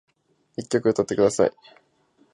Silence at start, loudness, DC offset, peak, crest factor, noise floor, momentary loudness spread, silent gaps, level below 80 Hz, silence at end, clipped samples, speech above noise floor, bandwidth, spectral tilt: 0.6 s; -22 LUFS; under 0.1%; -6 dBFS; 20 dB; -63 dBFS; 15 LU; none; -60 dBFS; 0.85 s; under 0.1%; 40 dB; 11.5 kHz; -5.5 dB/octave